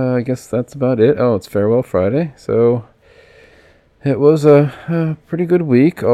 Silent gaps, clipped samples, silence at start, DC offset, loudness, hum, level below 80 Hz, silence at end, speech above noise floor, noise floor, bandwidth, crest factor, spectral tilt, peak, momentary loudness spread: none; under 0.1%; 0 s; under 0.1%; -15 LUFS; none; -52 dBFS; 0 s; 35 dB; -49 dBFS; 13.5 kHz; 14 dB; -8.5 dB/octave; 0 dBFS; 9 LU